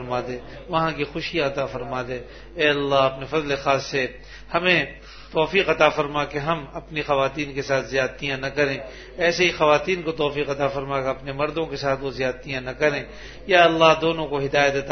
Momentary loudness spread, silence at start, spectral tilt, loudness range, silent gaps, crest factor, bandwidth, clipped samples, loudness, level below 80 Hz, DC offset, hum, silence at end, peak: 12 LU; 0 s; -4.5 dB/octave; 3 LU; none; 22 dB; 6.6 kHz; under 0.1%; -22 LUFS; -46 dBFS; under 0.1%; none; 0 s; 0 dBFS